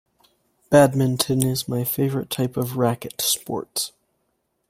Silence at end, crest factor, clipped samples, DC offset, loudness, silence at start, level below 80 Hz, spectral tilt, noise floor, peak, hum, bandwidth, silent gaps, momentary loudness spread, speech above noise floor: 0.8 s; 22 dB; under 0.1%; under 0.1%; -22 LUFS; 0.7 s; -58 dBFS; -5 dB/octave; -72 dBFS; -2 dBFS; none; 16.5 kHz; none; 10 LU; 51 dB